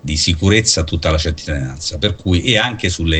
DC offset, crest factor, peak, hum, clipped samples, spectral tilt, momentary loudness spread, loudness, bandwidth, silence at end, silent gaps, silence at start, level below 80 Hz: under 0.1%; 16 dB; 0 dBFS; none; under 0.1%; -4 dB/octave; 9 LU; -16 LUFS; 9.4 kHz; 0 s; none; 0.05 s; -28 dBFS